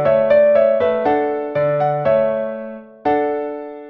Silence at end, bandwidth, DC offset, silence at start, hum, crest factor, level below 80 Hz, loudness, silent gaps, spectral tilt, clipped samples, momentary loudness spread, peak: 0 s; 4.8 kHz; under 0.1%; 0 s; none; 14 dB; -54 dBFS; -17 LUFS; none; -9 dB/octave; under 0.1%; 13 LU; -4 dBFS